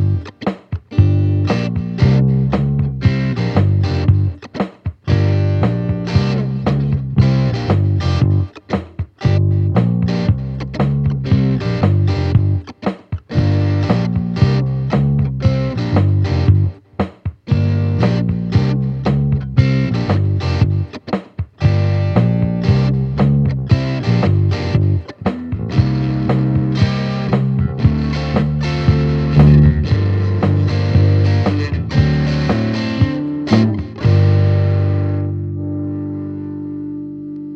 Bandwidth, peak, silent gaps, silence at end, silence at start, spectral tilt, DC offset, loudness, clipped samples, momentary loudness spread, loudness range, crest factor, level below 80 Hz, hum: 6.6 kHz; 0 dBFS; none; 0 s; 0 s; -8.5 dB/octave; under 0.1%; -16 LUFS; under 0.1%; 9 LU; 3 LU; 14 dB; -30 dBFS; 50 Hz at -35 dBFS